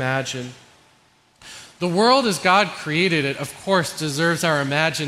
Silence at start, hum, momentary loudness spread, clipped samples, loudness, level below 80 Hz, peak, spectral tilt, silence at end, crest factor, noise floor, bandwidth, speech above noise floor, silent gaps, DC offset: 0 s; none; 16 LU; under 0.1%; -20 LUFS; -62 dBFS; -2 dBFS; -4 dB/octave; 0 s; 20 dB; -58 dBFS; 16 kHz; 37 dB; none; under 0.1%